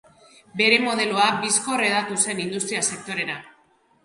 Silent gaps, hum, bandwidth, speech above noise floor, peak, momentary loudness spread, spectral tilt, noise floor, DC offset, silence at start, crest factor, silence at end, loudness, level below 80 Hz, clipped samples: none; none; 11.5 kHz; 38 dB; -2 dBFS; 10 LU; -1.5 dB/octave; -61 dBFS; under 0.1%; 0.55 s; 22 dB; 0.55 s; -21 LUFS; -70 dBFS; under 0.1%